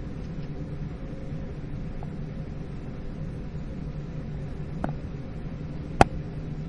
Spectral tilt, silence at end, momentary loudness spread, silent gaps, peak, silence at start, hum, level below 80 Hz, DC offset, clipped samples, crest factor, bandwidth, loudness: -7 dB/octave; 0 s; 13 LU; none; 0 dBFS; 0 s; none; -38 dBFS; under 0.1%; under 0.1%; 32 dB; 11 kHz; -33 LUFS